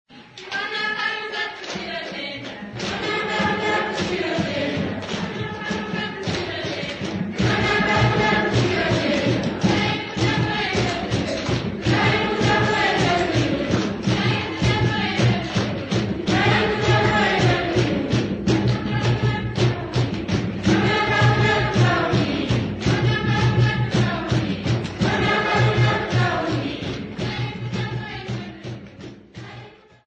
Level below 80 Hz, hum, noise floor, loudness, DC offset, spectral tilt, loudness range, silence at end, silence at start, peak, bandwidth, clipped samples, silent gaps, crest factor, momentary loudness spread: -40 dBFS; none; -43 dBFS; -21 LUFS; under 0.1%; -6 dB/octave; 5 LU; 0.35 s; 0.1 s; -6 dBFS; 8.6 kHz; under 0.1%; none; 14 dB; 10 LU